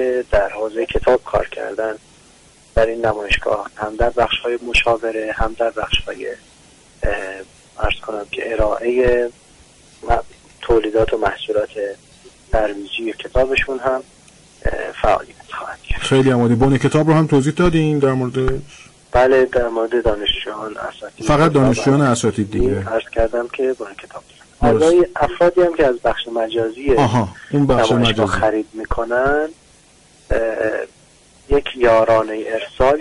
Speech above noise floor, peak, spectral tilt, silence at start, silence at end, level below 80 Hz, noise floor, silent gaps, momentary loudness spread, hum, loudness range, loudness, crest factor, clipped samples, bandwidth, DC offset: 32 dB; -4 dBFS; -6 dB/octave; 0 s; 0 s; -32 dBFS; -49 dBFS; none; 13 LU; none; 5 LU; -18 LUFS; 12 dB; under 0.1%; 11.5 kHz; under 0.1%